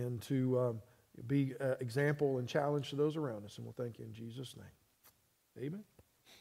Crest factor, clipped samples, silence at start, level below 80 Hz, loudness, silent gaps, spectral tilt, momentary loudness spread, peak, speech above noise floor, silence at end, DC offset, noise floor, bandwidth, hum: 18 dB; under 0.1%; 0 s; -76 dBFS; -37 LUFS; none; -7 dB/octave; 15 LU; -20 dBFS; 33 dB; 0.05 s; under 0.1%; -70 dBFS; 16 kHz; none